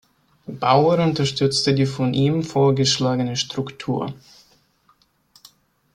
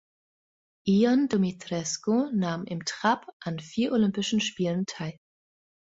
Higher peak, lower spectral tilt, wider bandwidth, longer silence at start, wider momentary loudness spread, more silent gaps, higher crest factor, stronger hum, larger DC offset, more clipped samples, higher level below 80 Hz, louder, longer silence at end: first, -2 dBFS vs -10 dBFS; about the same, -5.5 dB/octave vs -5 dB/octave; first, 11.5 kHz vs 8 kHz; second, 0.5 s vs 0.85 s; about the same, 10 LU vs 11 LU; second, none vs 3.33-3.40 s; about the same, 18 dB vs 18 dB; neither; neither; neither; first, -56 dBFS vs -66 dBFS; first, -20 LUFS vs -27 LUFS; first, 1.8 s vs 0.8 s